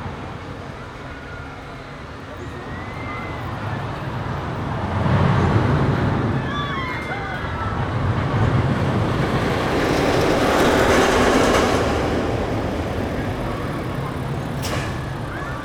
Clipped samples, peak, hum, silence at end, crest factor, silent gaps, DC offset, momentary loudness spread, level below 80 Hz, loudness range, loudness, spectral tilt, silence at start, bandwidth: under 0.1%; -4 dBFS; none; 0 s; 18 dB; none; under 0.1%; 17 LU; -34 dBFS; 12 LU; -21 LUFS; -6 dB/octave; 0 s; 18.5 kHz